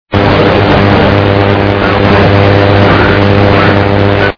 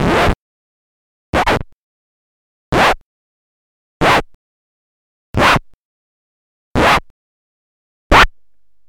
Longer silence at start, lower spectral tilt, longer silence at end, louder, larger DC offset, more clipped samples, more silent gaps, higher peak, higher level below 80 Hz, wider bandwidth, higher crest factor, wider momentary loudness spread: about the same, 0.1 s vs 0 s; first, -8 dB/octave vs -4.5 dB/octave; second, 0.05 s vs 0.6 s; first, -7 LUFS vs -14 LUFS; first, 3% vs 0.8%; first, 9% vs under 0.1%; second, none vs 0.35-1.33 s, 1.73-2.72 s, 3.02-4.00 s, 4.34-5.34 s, 5.74-6.75 s, 7.10-8.10 s; about the same, 0 dBFS vs 0 dBFS; first, -24 dBFS vs -30 dBFS; second, 5.4 kHz vs 19 kHz; second, 6 dB vs 18 dB; second, 2 LU vs 11 LU